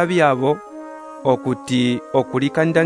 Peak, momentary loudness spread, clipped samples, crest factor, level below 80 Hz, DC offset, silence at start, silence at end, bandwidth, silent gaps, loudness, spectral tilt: -2 dBFS; 15 LU; under 0.1%; 16 dB; -60 dBFS; under 0.1%; 0 s; 0 s; 11 kHz; none; -19 LUFS; -6.5 dB/octave